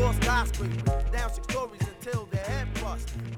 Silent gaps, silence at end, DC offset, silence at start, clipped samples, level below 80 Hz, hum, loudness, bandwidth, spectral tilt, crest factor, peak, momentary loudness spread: none; 0 s; under 0.1%; 0 s; under 0.1%; -32 dBFS; none; -30 LUFS; 16.5 kHz; -5.5 dB/octave; 16 dB; -12 dBFS; 9 LU